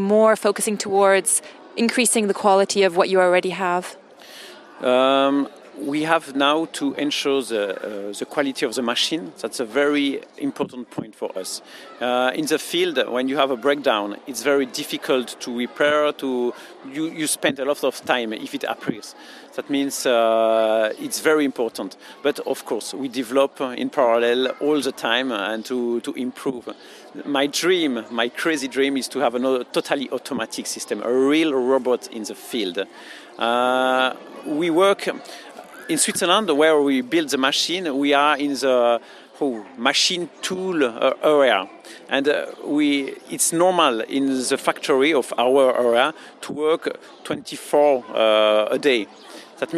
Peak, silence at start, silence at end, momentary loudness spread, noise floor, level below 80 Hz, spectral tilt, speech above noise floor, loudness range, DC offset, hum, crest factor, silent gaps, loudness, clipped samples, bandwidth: -2 dBFS; 0 s; 0 s; 13 LU; -42 dBFS; -72 dBFS; -3 dB/octave; 21 dB; 5 LU; under 0.1%; none; 20 dB; none; -21 LUFS; under 0.1%; 15.5 kHz